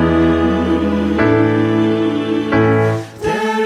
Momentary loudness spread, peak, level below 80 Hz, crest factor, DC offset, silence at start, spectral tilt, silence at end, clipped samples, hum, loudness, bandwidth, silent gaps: 5 LU; -2 dBFS; -34 dBFS; 12 dB; under 0.1%; 0 s; -7.5 dB/octave; 0 s; under 0.1%; none; -15 LUFS; 11 kHz; none